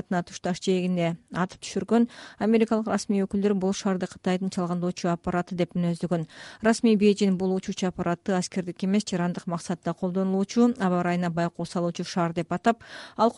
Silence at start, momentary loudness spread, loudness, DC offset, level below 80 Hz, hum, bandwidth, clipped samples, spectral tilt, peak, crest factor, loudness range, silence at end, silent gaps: 0.1 s; 8 LU; -26 LUFS; under 0.1%; -60 dBFS; none; 11.5 kHz; under 0.1%; -6 dB/octave; -8 dBFS; 18 dB; 2 LU; 0.05 s; none